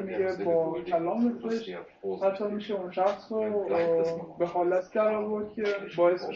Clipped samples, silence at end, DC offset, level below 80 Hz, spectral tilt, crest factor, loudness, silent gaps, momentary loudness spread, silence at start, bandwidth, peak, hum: under 0.1%; 0 s; under 0.1%; -68 dBFS; -5 dB/octave; 16 dB; -29 LUFS; none; 7 LU; 0 s; 7.2 kHz; -12 dBFS; none